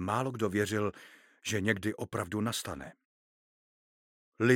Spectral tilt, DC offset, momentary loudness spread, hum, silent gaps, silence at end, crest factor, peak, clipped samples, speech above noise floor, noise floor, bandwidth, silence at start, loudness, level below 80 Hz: -5 dB/octave; under 0.1%; 11 LU; none; 3.05-4.32 s; 0 s; 24 dB; -10 dBFS; under 0.1%; over 57 dB; under -90 dBFS; 17 kHz; 0 s; -33 LUFS; -66 dBFS